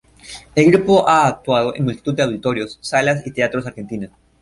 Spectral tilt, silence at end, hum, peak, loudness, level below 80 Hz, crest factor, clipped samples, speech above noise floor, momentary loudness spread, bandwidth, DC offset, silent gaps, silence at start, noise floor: -5.5 dB/octave; 0.35 s; none; -2 dBFS; -17 LUFS; -50 dBFS; 16 dB; under 0.1%; 22 dB; 16 LU; 11.5 kHz; under 0.1%; none; 0.25 s; -39 dBFS